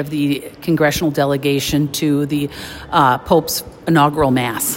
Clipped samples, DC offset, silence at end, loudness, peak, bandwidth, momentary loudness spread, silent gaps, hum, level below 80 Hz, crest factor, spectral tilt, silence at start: under 0.1%; under 0.1%; 0 s; -17 LUFS; 0 dBFS; 16.5 kHz; 8 LU; none; none; -42 dBFS; 16 dB; -5 dB/octave; 0 s